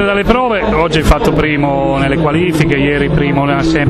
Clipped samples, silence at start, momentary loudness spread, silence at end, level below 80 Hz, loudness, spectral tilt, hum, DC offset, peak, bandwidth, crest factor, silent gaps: under 0.1%; 0 s; 2 LU; 0 s; -22 dBFS; -12 LUFS; -6.5 dB/octave; none; under 0.1%; 0 dBFS; 13.5 kHz; 12 dB; none